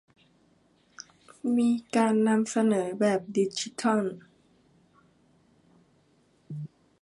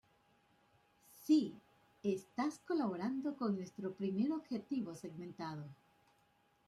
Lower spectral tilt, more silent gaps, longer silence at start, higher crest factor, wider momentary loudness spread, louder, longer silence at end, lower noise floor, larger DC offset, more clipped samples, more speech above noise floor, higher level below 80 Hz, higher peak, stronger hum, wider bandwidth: about the same, -5.5 dB/octave vs -6.5 dB/octave; neither; first, 1.45 s vs 1.15 s; about the same, 18 dB vs 20 dB; first, 23 LU vs 14 LU; first, -26 LUFS vs -40 LUFS; second, 0.35 s vs 0.95 s; second, -65 dBFS vs -74 dBFS; neither; neither; first, 40 dB vs 36 dB; first, -76 dBFS vs -82 dBFS; first, -10 dBFS vs -22 dBFS; neither; second, 11.5 kHz vs 13.5 kHz